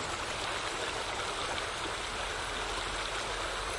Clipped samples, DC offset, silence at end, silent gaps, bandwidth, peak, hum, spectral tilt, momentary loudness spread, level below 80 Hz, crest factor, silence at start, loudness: under 0.1%; under 0.1%; 0 s; none; 11.5 kHz; -20 dBFS; none; -2 dB/octave; 1 LU; -48 dBFS; 16 dB; 0 s; -34 LUFS